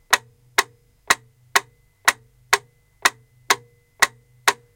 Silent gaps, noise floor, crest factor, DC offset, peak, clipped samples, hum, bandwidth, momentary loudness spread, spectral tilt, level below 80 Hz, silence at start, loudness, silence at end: none; -39 dBFS; 24 dB; under 0.1%; 0 dBFS; under 0.1%; none; 17 kHz; 2 LU; 0.5 dB/octave; -60 dBFS; 0.1 s; -22 LUFS; 0.2 s